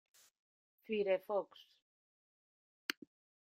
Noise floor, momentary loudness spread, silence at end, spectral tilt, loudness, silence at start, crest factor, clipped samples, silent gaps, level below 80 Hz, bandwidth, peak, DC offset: under -90 dBFS; 14 LU; 0.6 s; -4 dB/octave; -40 LUFS; 0.9 s; 26 dB; under 0.1%; 1.82-2.89 s; -88 dBFS; 16 kHz; -18 dBFS; under 0.1%